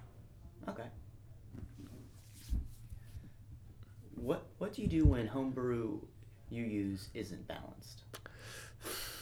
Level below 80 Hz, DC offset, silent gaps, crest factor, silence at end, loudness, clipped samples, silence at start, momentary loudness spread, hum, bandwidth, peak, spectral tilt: -48 dBFS; under 0.1%; none; 24 dB; 0 s; -39 LUFS; under 0.1%; 0 s; 20 LU; none; over 20 kHz; -16 dBFS; -6.5 dB/octave